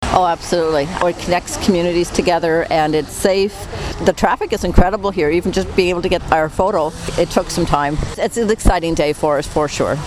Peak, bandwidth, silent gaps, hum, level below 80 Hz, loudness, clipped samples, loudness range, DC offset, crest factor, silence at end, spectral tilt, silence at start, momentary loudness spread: 0 dBFS; 15.5 kHz; none; none; -26 dBFS; -17 LUFS; under 0.1%; 1 LU; under 0.1%; 16 dB; 0 s; -5 dB/octave; 0 s; 4 LU